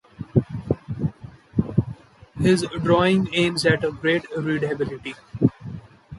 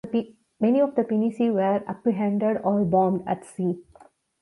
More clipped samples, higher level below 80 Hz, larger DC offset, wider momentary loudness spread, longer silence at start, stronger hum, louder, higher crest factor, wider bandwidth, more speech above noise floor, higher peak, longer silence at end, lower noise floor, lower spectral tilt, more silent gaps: neither; first, -46 dBFS vs -62 dBFS; neither; first, 16 LU vs 8 LU; first, 0.2 s vs 0.05 s; neither; about the same, -23 LUFS vs -24 LUFS; about the same, 18 dB vs 16 dB; about the same, 11.5 kHz vs 11.5 kHz; second, 20 dB vs 32 dB; first, -4 dBFS vs -8 dBFS; second, 0 s vs 0.6 s; second, -41 dBFS vs -55 dBFS; second, -6 dB/octave vs -9 dB/octave; neither